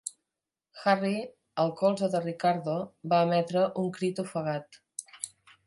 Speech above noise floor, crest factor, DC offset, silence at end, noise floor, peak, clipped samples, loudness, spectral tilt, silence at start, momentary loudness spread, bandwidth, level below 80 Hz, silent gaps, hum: 61 dB; 20 dB; under 0.1%; 0.4 s; -89 dBFS; -10 dBFS; under 0.1%; -29 LUFS; -5.5 dB/octave; 0.05 s; 14 LU; 11.5 kHz; -78 dBFS; none; none